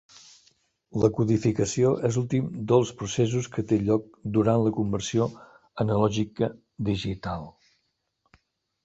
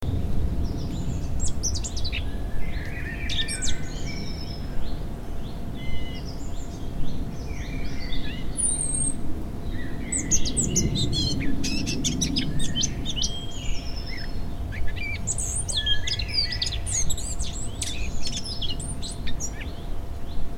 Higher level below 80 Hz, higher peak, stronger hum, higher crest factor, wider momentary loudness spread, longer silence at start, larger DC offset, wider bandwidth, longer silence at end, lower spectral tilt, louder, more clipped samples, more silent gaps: second, -52 dBFS vs -32 dBFS; about the same, -6 dBFS vs -6 dBFS; neither; about the same, 20 dB vs 18 dB; about the same, 9 LU vs 11 LU; first, 0.95 s vs 0 s; neither; second, 8.2 kHz vs 13.5 kHz; first, 1.35 s vs 0 s; first, -6.5 dB/octave vs -3 dB/octave; about the same, -26 LUFS vs -28 LUFS; neither; neither